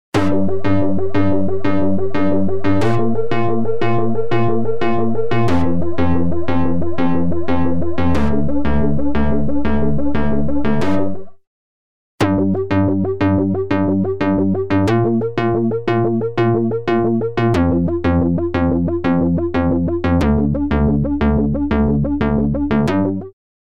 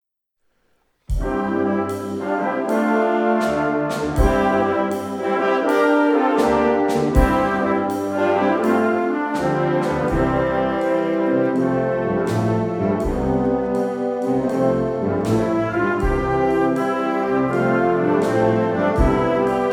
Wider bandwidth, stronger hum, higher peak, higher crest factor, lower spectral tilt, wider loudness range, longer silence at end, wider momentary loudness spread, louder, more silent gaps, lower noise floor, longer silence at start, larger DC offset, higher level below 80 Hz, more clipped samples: second, 10.5 kHz vs 19 kHz; neither; about the same, -4 dBFS vs -2 dBFS; second, 12 dB vs 18 dB; first, -8.5 dB/octave vs -7 dB/octave; about the same, 2 LU vs 3 LU; first, 0.3 s vs 0 s; about the same, 3 LU vs 5 LU; about the same, -18 LUFS vs -19 LUFS; first, 11.47-12.18 s vs none; first, under -90 dBFS vs -70 dBFS; second, 0.1 s vs 1.1 s; first, 6% vs under 0.1%; about the same, -32 dBFS vs -32 dBFS; neither